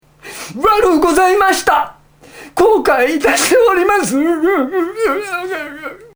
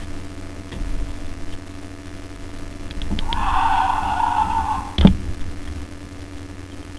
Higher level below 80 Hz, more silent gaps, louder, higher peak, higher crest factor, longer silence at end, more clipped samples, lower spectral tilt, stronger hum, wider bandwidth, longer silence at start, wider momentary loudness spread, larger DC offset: second, -42 dBFS vs -28 dBFS; neither; first, -13 LUFS vs -21 LUFS; about the same, 0 dBFS vs 0 dBFS; second, 14 dB vs 22 dB; about the same, 0.1 s vs 0 s; neither; second, -3 dB/octave vs -6 dB/octave; neither; first, over 20 kHz vs 11 kHz; first, 0.25 s vs 0 s; second, 15 LU vs 19 LU; second, under 0.1% vs 0.5%